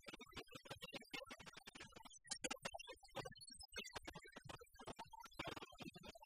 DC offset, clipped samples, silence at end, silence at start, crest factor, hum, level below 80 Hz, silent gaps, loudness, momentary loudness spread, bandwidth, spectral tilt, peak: under 0.1%; under 0.1%; 0 s; 0 s; 24 dB; none; -72 dBFS; none; -54 LUFS; 9 LU; 15.5 kHz; -2.5 dB/octave; -32 dBFS